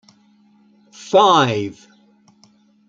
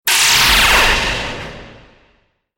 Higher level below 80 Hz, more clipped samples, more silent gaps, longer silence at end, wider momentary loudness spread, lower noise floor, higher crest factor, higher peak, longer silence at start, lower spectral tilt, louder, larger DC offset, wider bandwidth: second, -66 dBFS vs -28 dBFS; neither; neither; first, 1.15 s vs 0.85 s; about the same, 19 LU vs 18 LU; second, -54 dBFS vs -59 dBFS; about the same, 20 dB vs 16 dB; about the same, 0 dBFS vs 0 dBFS; first, 1 s vs 0.05 s; first, -4.5 dB/octave vs -0.5 dB/octave; second, -15 LUFS vs -10 LUFS; neither; second, 7.8 kHz vs 17 kHz